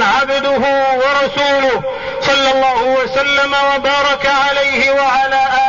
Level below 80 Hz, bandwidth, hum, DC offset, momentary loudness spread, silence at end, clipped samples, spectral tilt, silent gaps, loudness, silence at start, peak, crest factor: -44 dBFS; 7.4 kHz; none; 0.6%; 2 LU; 0 s; under 0.1%; -2.5 dB/octave; none; -13 LUFS; 0 s; -4 dBFS; 10 dB